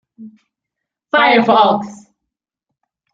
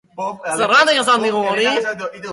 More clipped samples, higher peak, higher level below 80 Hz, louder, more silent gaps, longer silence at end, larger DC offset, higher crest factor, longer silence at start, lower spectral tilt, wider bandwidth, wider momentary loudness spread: neither; about the same, -2 dBFS vs -2 dBFS; about the same, -64 dBFS vs -64 dBFS; first, -12 LUFS vs -16 LUFS; neither; first, 1.2 s vs 0 s; neither; about the same, 16 dB vs 14 dB; about the same, 0.2 s vs 0.15 s; first, -5.5 dB/octave vs -2 dB/octave; second, 7.8 kHz vs 11.5 kHz; about the same, 11 LU vs 13 LU